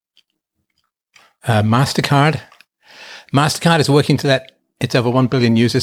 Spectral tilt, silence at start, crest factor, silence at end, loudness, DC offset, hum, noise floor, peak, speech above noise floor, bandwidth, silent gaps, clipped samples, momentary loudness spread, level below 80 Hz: -5.5 dB/octave; 1.45 s; 16 dB; 0 s; -15 LUFS; under 0.1%; none; -72 dBFS; -2 dBFS; 58 dB; 15.5 kHz; none; under 0.1%; 12 LU; -52 dBFS